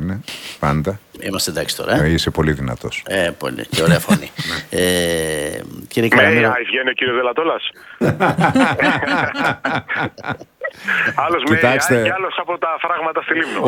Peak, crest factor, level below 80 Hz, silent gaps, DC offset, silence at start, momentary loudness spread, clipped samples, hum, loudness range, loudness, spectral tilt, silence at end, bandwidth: 0 dBFS; 18 dB; -40 dBFS; none; under 0.1%; 0 s; 11 LU; under 0.1%; none; 3 LU; -17 LUFS; -4.5 dB/octave; 0 s; 19 kHz